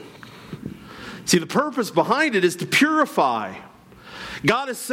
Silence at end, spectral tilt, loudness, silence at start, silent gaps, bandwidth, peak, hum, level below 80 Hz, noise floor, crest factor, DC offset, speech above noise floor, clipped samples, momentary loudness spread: 0 s; -4 dB/octave; -20 LUFS; 0 s; none; 17 kHz; -6 dBFS; none; -58 dBFS; -43 dBFS; 18 dB; under 0.1%; 23 dB; under 0.1%; 20 LU